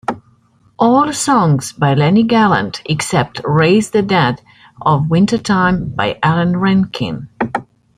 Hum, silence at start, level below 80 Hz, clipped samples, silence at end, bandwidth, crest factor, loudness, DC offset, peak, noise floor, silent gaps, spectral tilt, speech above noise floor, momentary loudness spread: none; 0.1 s; -46 dBFS; under 0.1%; 0.35 s; 14.5 kHz; 14 dB; -14 LUFS; under 0.1%; -2 dBFS; -53 dBFS; none; -6 dB/octave; 39 dB; 9 LU